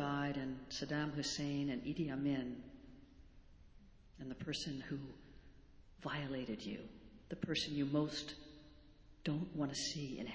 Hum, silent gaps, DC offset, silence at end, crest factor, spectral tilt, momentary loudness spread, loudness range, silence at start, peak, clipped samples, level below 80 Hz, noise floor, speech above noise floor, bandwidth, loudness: none; none; under 0.1%; 0 s; 18 dB; -5 dB/octave; 19 LU; 7 LU; 0 s; -24 dBFS; under 0.1%; -64 dBFS; -62 dBFS; 20 dB; 8 kHz; -42 LUFS